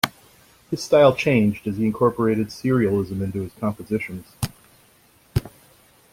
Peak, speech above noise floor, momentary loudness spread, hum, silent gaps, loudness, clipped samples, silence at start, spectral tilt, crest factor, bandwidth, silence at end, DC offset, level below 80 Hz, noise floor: -2 dBFS; 35 dB; 15 LU; none; none; -22 LUFS; under 0.1%; 0.05 s; -6.5 dB/octave; 22 dB; 16.5 kHz; 0.65 s; under 0.1%; -48 dBFS; -56 dBFS